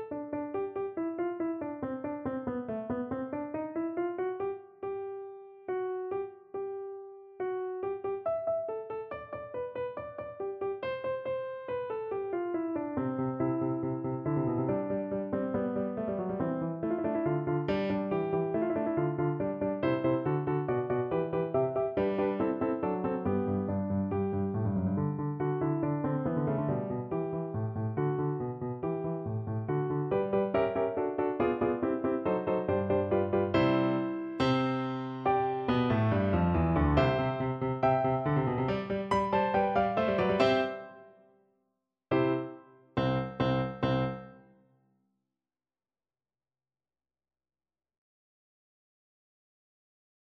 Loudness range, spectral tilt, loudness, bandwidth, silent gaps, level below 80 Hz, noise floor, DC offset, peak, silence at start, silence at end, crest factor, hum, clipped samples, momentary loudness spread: 8 LU; -9 dB/octave; -32 LUFS; 7.6 kHz; none; -52 dBFS; under -90 dBFS; under 0.1%; -12 dBFS; 0 s; 5.9 s; 20 dB; none; under 0.1%; 9 LU